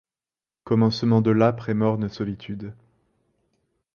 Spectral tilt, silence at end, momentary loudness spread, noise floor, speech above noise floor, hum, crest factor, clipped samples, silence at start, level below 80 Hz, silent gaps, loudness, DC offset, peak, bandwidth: -8.5 dB/octave; 1.2 s; 15 LU; under -90 dBFS; over 68 dB; none; 20 dB; under 0.1%; 0.65 s; -56 dBFS; none; -22 LUFS; under 0.1%; -4 dBFS; 6.8 kHz